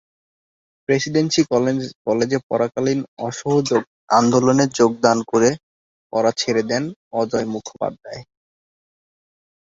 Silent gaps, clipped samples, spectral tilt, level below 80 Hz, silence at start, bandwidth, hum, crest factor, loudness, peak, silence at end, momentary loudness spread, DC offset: 1.95-2.05 s, 2.43-2.50 s, 3.08-3.17 s, 3.87-4.08 s, 5.63-6.10 s, 6.96-7.11 s; under 0.1%; -5 dB/octave; -58 dBFS; 0.9 s; 8 kHz; none; 18 dB; -19 LUFS; -2 dBFS; 1.4 s; 12 LU; under 0.1%